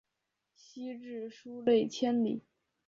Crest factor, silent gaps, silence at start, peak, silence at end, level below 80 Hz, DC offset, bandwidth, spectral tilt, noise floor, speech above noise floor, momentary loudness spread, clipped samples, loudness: 18 dB; none; 0.75 s; -16 dBFS; 0.5 s; -78 dBFS; under 0.1%; 7.4 kHz; -5.5 dB/octave; -85 dBFS; 53 dB; 16 LU; under 0.1%; -33 LUFS